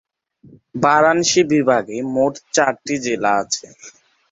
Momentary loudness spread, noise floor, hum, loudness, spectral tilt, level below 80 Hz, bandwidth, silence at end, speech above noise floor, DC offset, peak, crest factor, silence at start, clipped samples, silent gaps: 9 LU; -49 dBFS; none; -17 LUFS; -3.5 dB/octave; -60 dBFS; 8.2 kHz; 0.45 s; 32 dB; under 0.1%; 0 dBFS; 18 dB; 0.75 s; under 0.1%; none